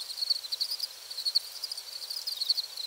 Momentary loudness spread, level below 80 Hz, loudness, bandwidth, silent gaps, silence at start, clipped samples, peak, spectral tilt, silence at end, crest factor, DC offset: 8 LU; -84 dBFS; -31 LUFS; over 20 kHz; none; 0 s; under 0.1%; -14 dBFS; 4 dB/octave; 0 s; 20 dB; under 0.1%